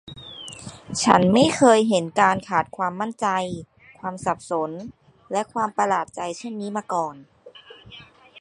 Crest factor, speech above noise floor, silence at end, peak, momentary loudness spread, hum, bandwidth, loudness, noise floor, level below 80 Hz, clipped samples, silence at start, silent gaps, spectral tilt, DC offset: 22 dB; 25 dB; 0.35 s; 0 dBFS; 20 LU; none; 11.5 kHz; -22 LUFS; -46 dBFS; -58 dBFS; under 0.1%; 0.05 s; none; -4.5 dB/octave; under 0.1%